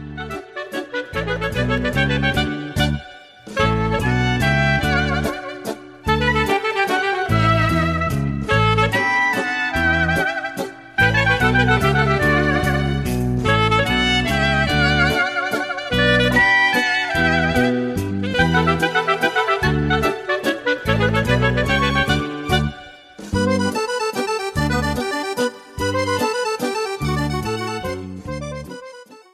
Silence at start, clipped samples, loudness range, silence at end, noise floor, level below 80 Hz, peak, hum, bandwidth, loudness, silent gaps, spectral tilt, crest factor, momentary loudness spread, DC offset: 0 s; under 0.1%; 5 LU; 0.15 s; -40 dBFS; -32 dBFS; -4 dBFS; none; 14.5 kHz; -18 LUFS; none; -5.5 dB/octave; 16 dB; 11 LU; under 0.1%